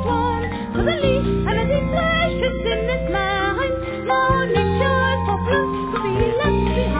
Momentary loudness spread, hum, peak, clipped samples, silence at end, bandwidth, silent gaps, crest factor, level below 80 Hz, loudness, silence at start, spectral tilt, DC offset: 4 LU; none; -4 dBFS; under 0.1%; 0 s; 4 kHz; none; 14 dB; -30 dBFS; -20 LUFS; 0 s; -10 dB/octave; 0.1%